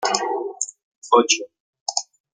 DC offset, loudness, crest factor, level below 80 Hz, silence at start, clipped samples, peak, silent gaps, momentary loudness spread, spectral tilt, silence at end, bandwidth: under 0.1%; -22 LUFS; 22 dB; -74 dBFS; 0 s; under 0.1%; -2 dBFS; 0.83-1.02 s, 1.60-1.73 s, 1.80-1.86 s; 13 LU; -0.5 dB/octave; 0.3 s; 10 kHz